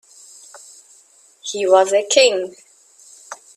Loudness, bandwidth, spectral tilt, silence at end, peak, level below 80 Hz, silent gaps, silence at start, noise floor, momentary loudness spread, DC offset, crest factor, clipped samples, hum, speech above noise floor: -15 LUFS; 12.5 kHz; -1 dB/octave; 0.2 s; 0 dBFS; -72 dBFS; none; 0.55 s; -52 dBFS; 26 LU; under 0.1%; 20 dB; under 0.1%; none; 36 dB